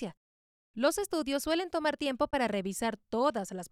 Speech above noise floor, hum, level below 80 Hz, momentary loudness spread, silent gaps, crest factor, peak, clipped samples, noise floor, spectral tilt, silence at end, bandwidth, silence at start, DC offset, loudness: over 59 dB; none; -60 dBFS; 5 LU; 0.17-0.74 s; 18 dB; -16 dBFS; under 0.1%; under -90 dBFS; -4 dB/octave; 0.05 s; 16.5 kHz; 0 s; under 0.1%; -32 LUFS